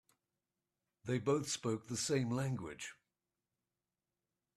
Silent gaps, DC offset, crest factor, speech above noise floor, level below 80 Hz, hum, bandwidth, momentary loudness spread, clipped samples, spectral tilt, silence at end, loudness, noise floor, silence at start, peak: none; under 0.1%; 20 dB; over 52 dB; -76 dBFS; none; 13.5 kHz; 13 LU; under 0.1%; -5 dB/octave; 1.65 s; -38 LUFS; under -90 dBFS; 1.05 s; -22 dBFS